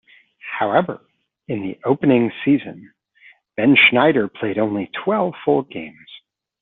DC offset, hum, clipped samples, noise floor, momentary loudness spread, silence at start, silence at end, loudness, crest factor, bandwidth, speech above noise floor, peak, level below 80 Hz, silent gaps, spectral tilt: under 0.1%; none; under 0.1%; -51 dBFS; 21 LU; 0.45 s; 0.45 s; -18 LUFS; 18 dB; 4.1 kHz; 33 dB; -2 dBFS; -62 dBFS; none; -3.5 dB/octave